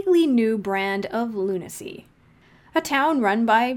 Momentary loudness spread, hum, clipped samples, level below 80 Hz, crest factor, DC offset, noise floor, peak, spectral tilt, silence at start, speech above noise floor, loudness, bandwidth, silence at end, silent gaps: 13 LU; none; under 0.1%; -62 dBFS; 16 dB; under 0.1%; -55 dBFS; -6 dBFS; -5 dB/octave; 0 s; 33 dB; -22 LUFS; 18.5 kHz; 0 s; none